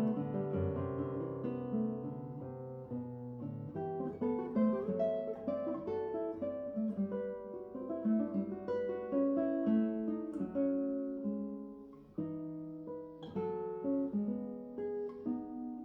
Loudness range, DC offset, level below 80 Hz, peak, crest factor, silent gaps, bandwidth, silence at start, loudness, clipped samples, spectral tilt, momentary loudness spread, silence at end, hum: 5 LU; under 0.1%; -70 dBFS; -22 dBFS; 16 dB; none; 4.7 kHz; 0 s; -38 LUFS; under 0.1%; -11 dB/octave; 12 LU; 0 s; none